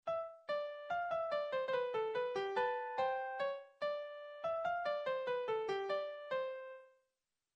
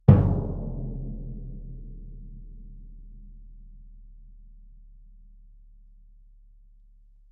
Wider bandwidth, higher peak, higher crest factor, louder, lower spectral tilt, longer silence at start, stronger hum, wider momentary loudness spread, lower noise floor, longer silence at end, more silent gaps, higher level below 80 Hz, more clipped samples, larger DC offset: first, 8.4 kHz vs 3.5 kHz; second, -26 dBFS vs -2 dBFS; second, 14 dB vs 28 dB; second, -40 LUFS vs -27 LUFS; second, -4.5 dB/octave vs -11.5 dB/octave; about the same, 0.05 s vs 0.1 s; neither; second, 6 LU vs 26 LU; first, -90 dBFS vs -54 dBFS; second, 0.7 s vs 2.5 s; neither; second, -82 dBFS vs -38 dBFS; neither; neither